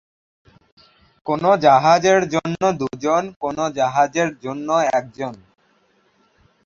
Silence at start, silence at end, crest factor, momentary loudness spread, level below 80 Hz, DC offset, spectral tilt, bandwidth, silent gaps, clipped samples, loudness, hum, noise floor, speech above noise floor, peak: 1.25 s; 1.3 s; 18 dB; 14 LU; -58 dBFS; under 0.1%; -5 dB/octave; 7.4 kHz; 3.36-3.40 s; under 0.1%; -18 LUFS; none; -61 dBFS; 43 dB; -2 dBFS